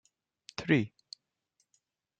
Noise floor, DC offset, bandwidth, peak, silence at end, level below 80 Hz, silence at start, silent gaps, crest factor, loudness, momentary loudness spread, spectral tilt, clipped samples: -79 dBFS; under 0.1%; 8.8 kHz; -12 dBFS; 1.3 s; -70 dBFS; 0.6 s; none; 24 dB; -31 LUFS; 22 LU; -6.5 dB/octave; under 0.1%